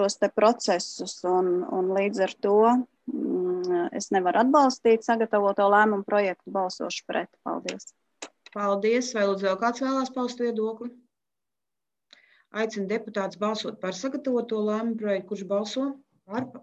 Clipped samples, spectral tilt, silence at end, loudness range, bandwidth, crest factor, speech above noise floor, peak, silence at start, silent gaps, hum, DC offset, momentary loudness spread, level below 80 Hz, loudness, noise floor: under 0.1%; -4.5 dB/octave; 0.05 s; 9 LU; 9.2 kHz; 18 dB; over 65 dB; -8 dBFS; 0 s; none; none; under 0.1%; 13 LU; -76 dBFS; -26 LUFS; under -90 dBFS